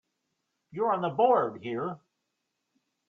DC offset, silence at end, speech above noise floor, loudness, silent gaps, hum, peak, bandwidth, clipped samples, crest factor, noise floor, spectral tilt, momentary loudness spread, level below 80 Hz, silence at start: under 0.1%; 1.15 s; 54 dB; -28 LUFS; none; none; -10 dBFS; 6 kHz; under 0.1%; 20 dB; -82 dBFS; -8.5 dB/octave; 17 LU; -78 dBFS; 0.75 s